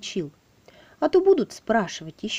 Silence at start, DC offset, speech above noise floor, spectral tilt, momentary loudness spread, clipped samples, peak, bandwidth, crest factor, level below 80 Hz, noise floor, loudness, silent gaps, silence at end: 0 s; under 0.1%; 31 dB; -4.5 dB/octave; 14 LU; under 0.1%; -8 dBFS; 10 kHz; 16 dB; -60 dBFS; -54 dBFS; -23 LUFS; none; 0 s